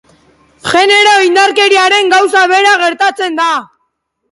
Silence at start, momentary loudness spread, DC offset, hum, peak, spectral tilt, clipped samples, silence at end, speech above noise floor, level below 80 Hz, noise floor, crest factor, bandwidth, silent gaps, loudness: 0.65 s; 7 LU; under 0.1%; none; 0 dBFS; -1.5 dB/octave; under 0.1%; 0.65 s; 57 dB; -56 dBFS; -65 dBFS; 10 dB; 11.5 kHz; none; -8 LUFS